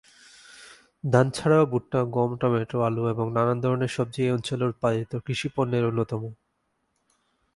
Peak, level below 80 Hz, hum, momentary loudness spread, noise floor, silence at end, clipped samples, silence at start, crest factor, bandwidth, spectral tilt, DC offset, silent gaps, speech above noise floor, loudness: -4 dBFS; -58 dBFS; none; 8 LU; -74 dBFS; 1.2 s; under 0.1%; 0.5 s; 22 dB; 11.5 kHz; -7 dB/octave; under 0.1%; none; 50 dB; -25 LUFS